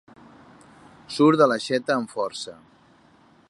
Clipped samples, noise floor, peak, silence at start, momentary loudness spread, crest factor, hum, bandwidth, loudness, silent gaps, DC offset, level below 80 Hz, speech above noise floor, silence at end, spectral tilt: under 0.1%; -56 dBFS; -4 dBFS; 1.1 s; 18 LU; 22 dB; none; 11.5 kHz; -22 LUFS; none; under 0.1%; -68 dBFS; 34 dB; 0.95 s; -5.5 dB/octave